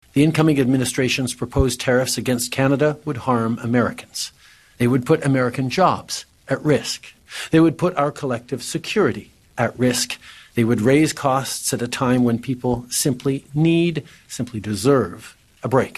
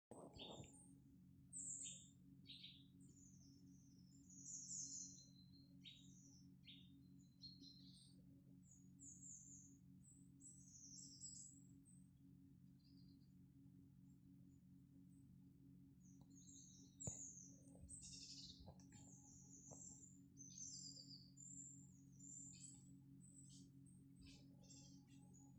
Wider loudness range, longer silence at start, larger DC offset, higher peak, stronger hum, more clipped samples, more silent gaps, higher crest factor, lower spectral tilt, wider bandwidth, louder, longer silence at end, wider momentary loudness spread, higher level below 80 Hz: second, 2 LU vs 10 LU; about the same, 0.15 s vs 0.1 s; neither; first, -2 dBFS vs -36 dBFS; neither; neither; neither; second, 18 dB vs 26 dB; first, -5 dB/octave vs -3 dB/octave; first, 13 kHz vs 9 kHz; first, -20 LUFS vs -60 LUFS; about the same, 0.05 s vs 0 s; about the same, 12 LU vs 14 LU; first, -44 dBFS vs -80 dBFS